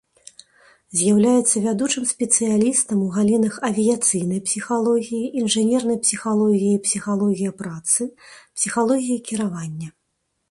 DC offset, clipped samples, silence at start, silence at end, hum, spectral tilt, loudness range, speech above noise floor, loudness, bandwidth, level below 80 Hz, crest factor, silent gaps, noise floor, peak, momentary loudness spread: under 0.1%; under 0.1%; 0.9 s; 0.6 s; none; -4 dB/octave; 4 LU; 53 dB; -20 LUFS; 11.5 kHz; -62 dBFS; 20 dB; none; -73 dBFS; -2 dBFS; 9 LU